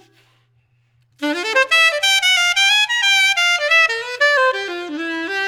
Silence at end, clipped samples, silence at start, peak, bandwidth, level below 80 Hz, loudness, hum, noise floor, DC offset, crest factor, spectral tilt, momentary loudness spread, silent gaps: 0 s; under 0.1%; 1.2 s; -2 dBFS; over 20 kHz; -66 dBFS; -14 LUFS; none; -60 dBFS; under 0.1%; 16 dB; 1 dB/octave; 12 LU; none